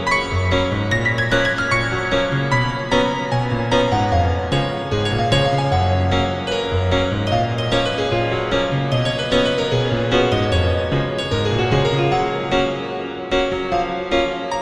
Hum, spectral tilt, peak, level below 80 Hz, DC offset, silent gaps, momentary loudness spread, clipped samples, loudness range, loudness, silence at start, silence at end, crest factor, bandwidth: none; -5.5 dB/octave; -4 dBFS; -36 dBFS; under 0.1%; none; 4 LU; under 0.1%; 1 LU; -19 LUFS; 0 s; 0 s; 16 dB; 11 kHz